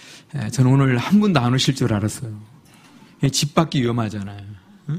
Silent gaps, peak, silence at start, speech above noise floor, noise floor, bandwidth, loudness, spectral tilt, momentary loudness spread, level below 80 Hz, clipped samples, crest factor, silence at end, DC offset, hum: none; 0 dBFS; 0 s; 29 dB; -48 dBFS; 15.5 kHz; -19 LUFS; -5.5 dB/octave; 18 LU; -50 dBFS; under 0.1%; 20 dB; 0 s; under 0.1%; none